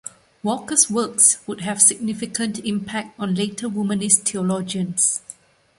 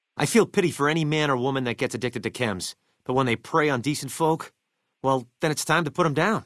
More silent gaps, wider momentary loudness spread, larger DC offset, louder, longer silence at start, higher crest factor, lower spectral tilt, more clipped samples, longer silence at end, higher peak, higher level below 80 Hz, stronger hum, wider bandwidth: neither; first, 12 LU vs 8 LU; neither; first, -19 LUFS vs -24 LUFS; about the same, 0.05 s vs 0.15 s; about the same, 22 dB vs 20 dB; second, -3 dB/octave vs -5 dB/octave; neither; first, 0.45 s vs 0.05 s; first, 0 dBFS vs -6 dBFS; about the same, -62 dBFS vs -62 dBFS; neither; about the same, 12 kHz vs 12 kHz